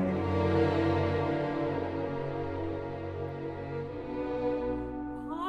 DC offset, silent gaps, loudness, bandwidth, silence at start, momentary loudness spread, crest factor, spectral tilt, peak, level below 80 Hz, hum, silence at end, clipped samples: under 0.1%; none; -32 LUFS; 8 kHz; 0 s; 10 LU; 16 dB; -8.5 dB/octave; -16 dBFS; -52 dBFS; none; 0 s; under 0.1%